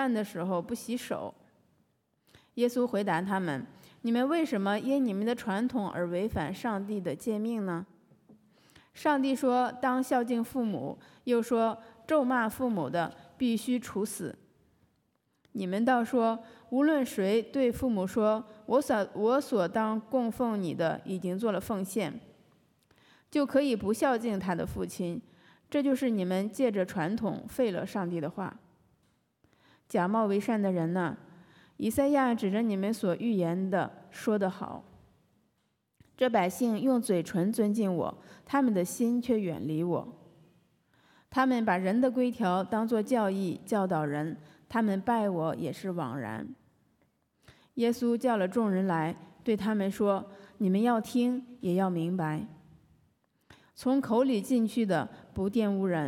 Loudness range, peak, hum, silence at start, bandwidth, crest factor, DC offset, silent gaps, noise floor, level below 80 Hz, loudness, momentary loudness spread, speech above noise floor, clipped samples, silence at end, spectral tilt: 4 LU; -14 dBFS; none; 0 s; 17.5 kHz; 16 dB; under 0.1%; none; -76 dBFS; -66 dBFS; -30 LUFS; 9 LU; 47 dB; under 0.1%; 0 s; -6.5 dB/octave